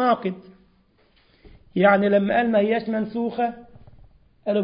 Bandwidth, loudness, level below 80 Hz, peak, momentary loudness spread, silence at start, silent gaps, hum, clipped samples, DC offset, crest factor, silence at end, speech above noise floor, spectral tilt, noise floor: 5.4 kHz; -22 LUFS; -58 dBFS; -4 dBFS; 14 LU; 0 s; none; none; under 0.1%; under 0.1%; 18 dB; 0 s; 39 dB; -11 dB/octave; -60 dBFS